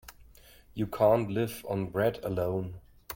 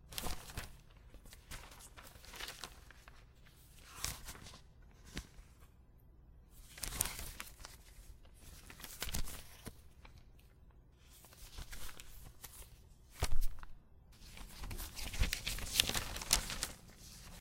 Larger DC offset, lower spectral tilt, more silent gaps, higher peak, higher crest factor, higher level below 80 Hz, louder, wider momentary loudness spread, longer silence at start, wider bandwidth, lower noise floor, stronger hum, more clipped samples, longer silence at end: neither; first, -7 dB/octave vs -1.5 dB/octave; neither; second, -12 dBFS vs -6 dBFS; second, 18 dB vs 34 dB; second, -56 dBFS vs -48 dBFS; first, -30 LUFS vs -42 LUFS; second, 16 LU vs 24 LU; about the same, 0.05 s vs 0.05 s; about the same, 17 kHz vs 16.5 kHz; second, -56 dBFS vs -62 dBFS; neither; neither; about the same, 0 s vs 0 s